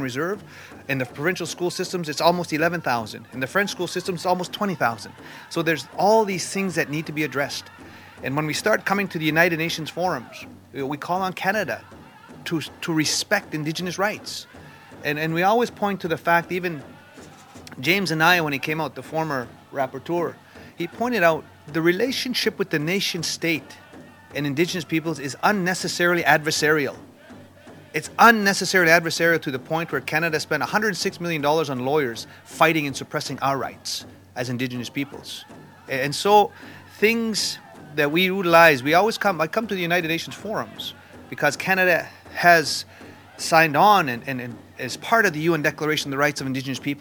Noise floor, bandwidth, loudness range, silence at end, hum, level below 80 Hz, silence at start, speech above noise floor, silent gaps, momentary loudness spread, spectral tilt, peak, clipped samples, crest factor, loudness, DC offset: -46 dBFS; 19.5 kHz; 6 LU; 0 s; none; -68 dBFS; 0 s; 23 dB; none; 14 LU; -4 dB/octave; 0 dBFS; under 0.1%; 22 dB; -22 LUFS; under 0.1%